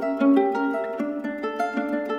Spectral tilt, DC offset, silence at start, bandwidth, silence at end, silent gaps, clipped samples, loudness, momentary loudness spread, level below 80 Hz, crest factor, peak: -6.5 dB/octave; under 0.1%; 0 s; 10.5 kHz; 0 s; none; under 0.1%; -24 LUFS; 9 LU; -66 dBFS; 16 dB; -8 dBFS